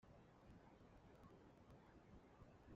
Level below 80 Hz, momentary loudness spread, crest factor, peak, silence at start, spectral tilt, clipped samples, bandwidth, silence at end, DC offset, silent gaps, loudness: -74 dBFS; 1 LU; 16 dB; -50 dBFS; 0 s; -6.5 dB/octave; under 0.1%; 7.4 kHz; 0 s; under 0.1%; none; -68 LUFS